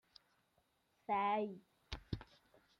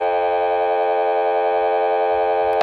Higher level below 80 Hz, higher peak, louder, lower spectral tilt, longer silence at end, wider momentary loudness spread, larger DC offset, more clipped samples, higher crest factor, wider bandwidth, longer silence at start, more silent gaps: second, -62 dBFS vs -56 dBFS; second, -24 dBFS vs -4 dBFS; second, -42 LUFS vs -19 LUFS; about the same, -6.5 dB/octave vs -5.5 dB/octave; first, 0.55 s vs 0 s; first, 18 LU vs 0 LU; neither; neither; first, 20 dB vs 14 dB; first, 11.5 kHz vs 4.8 kHz; first, 1.1 s vs 0 s; neither